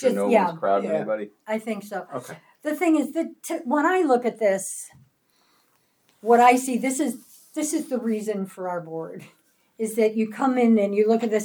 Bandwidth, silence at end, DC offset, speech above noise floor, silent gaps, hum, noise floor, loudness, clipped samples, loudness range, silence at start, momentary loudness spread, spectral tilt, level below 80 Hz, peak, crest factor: over 20 kHz; 0 s; under 0.1%; 43 dB; none; none; -66 dBFS; -23 LUFS; under 0.1%; 5 LU; 0 s; 15 LU; -5 dB/octave; -82 dBFS; -4 dBFS; 20 dB